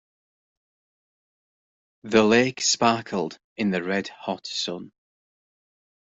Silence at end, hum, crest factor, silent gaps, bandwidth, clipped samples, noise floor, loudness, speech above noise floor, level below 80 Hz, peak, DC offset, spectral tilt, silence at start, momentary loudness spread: 1.25 s; none; 22 dB; 3.44-3.56 s; 8.2 kHz; under 0.1%; under -90 dBFS; -23 LUFS; over 67 dB; -64 dBFS; -4 dBFS; under 0.1%; -3.5 dB/octave; 2.05 s; 13 LU